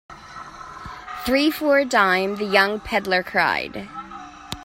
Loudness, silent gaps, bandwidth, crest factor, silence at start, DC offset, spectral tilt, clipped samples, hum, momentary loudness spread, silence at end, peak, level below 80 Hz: -20 LUFS; none; 16 kHz; 22 dB; 0.1 s; under 0.1%; -4 dB/octave; under 0.1%; none; 20 LU; 0 s; 0 dBFS; -50 dBFS